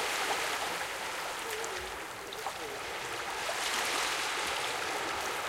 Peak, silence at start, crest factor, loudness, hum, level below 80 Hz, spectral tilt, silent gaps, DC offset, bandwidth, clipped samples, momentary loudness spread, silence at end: -16 dBFS; 0 s; 18 dB; -34 LUFS; none; -62 dBFS; -0.5 dB/octave; none; under 0.1%; 17 kHz; under 0.1%; 8 LU; 0 s